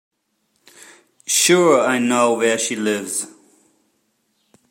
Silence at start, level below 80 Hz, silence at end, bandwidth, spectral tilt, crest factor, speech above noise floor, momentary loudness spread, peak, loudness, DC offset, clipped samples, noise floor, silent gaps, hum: 1.3 s; -74 dBFS; 1.45 s; 16.5 kHz; -2.5 dB/octave; 18 dB; 52 dB; 12 LU; -2 dBFS; -17 LUFS; under 0.1%; under 0.1%; -69 dBFS; none; none